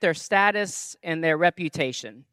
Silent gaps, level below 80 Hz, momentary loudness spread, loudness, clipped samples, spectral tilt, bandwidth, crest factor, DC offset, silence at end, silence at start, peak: none; -70 dBFS; 10 LU; -24 LUFS; under 0.1%; -4 dB/octave; 15 kHz; 20 dB; under 0.1%; 0.1 s; 0 s; -6 dBFS